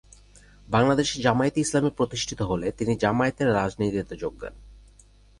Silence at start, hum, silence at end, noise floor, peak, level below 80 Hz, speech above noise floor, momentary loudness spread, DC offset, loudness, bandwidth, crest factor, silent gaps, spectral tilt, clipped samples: 0.7 s; 50 Hz at -45 dBFS; 0.6 s; -54 dBFS; -6 dBFS; -48 dBFS; 30 dB; 11 LU; under 0.1%; -25 LUFS; 11.5 kHz; 18 dB; none; -5 dB/octave; under 0.1%